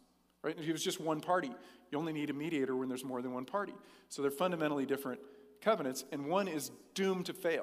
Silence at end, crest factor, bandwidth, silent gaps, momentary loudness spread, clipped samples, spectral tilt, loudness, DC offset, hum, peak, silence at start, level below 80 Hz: 0 s; 20 dB; 15.5 kHz; none; 9 LU; under 0.1%; -4.5 dB/octave; -37 LUFS; under 0.1%; none; -18 dBFS; 0.45 s; -84 dBFS